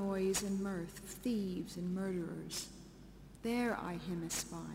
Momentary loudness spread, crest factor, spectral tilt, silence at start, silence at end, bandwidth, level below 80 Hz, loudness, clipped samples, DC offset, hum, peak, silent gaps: 13 LU; 18 dB; -4.5 dB/octave; 0 s; 0 s; 16 kHz; -60 dBFS; -39 LUFS; under 0.1%; under 0.1%; none; -22 dBFS; none